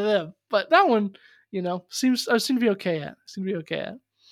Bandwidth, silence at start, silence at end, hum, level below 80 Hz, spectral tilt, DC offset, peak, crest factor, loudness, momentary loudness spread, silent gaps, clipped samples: 16 kHz; 0 s; 0.35 s; none; -74 dBFS; -4.5 dB/octave; under 0.1%; -4 dBFS; 20 dB; -24 LUFS; 14 LU; none; under 0.1%